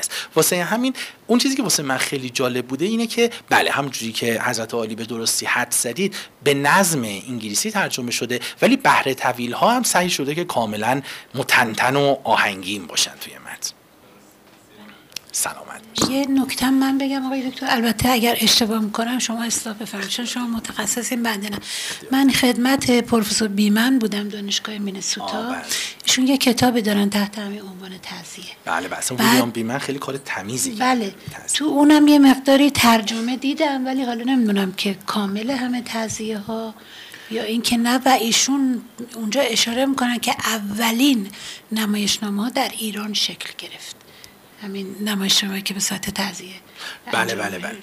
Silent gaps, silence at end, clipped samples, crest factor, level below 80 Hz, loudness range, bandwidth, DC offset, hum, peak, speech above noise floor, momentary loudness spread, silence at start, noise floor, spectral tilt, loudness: none; 0 s; under 0.1%; 16 dB; -54 dBFS; 6 LU; 16 kHz; under 0.1%; none; -6 dBFS; 29 dB; 14 LU; 0 s; -49 dBFS; -3 dB/octave; -19 LUFS